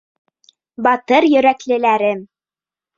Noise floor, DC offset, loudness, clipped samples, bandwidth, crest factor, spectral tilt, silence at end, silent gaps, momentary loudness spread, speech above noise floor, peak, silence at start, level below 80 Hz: under -90 dBFS; under 0.1%; -15 LUFS; under 0.1%; 7.6 kHz; 16 dB; -5 dB/octave; 0.75 s; none; 7 LU; over 76 dB; 0 dBFS; 0.8 s; -62 dBFS